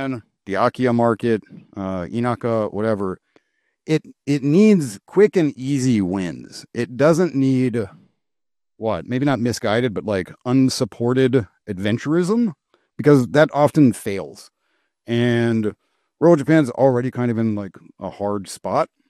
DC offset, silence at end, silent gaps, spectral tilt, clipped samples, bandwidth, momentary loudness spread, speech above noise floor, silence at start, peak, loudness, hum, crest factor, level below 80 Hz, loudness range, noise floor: under 0.1%; 0.25 s; none; -7 dB/octave; under 0.1%; 13.5 kHz; 13 LU; over 71 dB; 0 s; -2 dBFS; -19 LUFS; none; 18 dB; -58 dBFS; 4 LU; under -90 dBFS